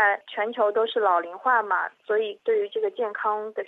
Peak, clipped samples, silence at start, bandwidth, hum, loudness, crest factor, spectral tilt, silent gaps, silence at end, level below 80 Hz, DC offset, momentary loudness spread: -8 dBFS; under 0.1%; 0 s; 4.1 kHz; none; -25 LUFS; 16 dB; -4.5 dB/octave; none; 0 s; under -90 dBFS; under 0.1%; 5 LU